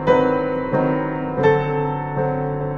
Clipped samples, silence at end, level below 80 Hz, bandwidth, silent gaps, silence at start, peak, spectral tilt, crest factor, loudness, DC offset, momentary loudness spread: under 0.1%; 0 s; -42 dBFS; 7 kHz; none; 0 s; -2 dBFS; -9 dB/octave; 16 dB; -20 LUFS; under 0.1%; 6 LU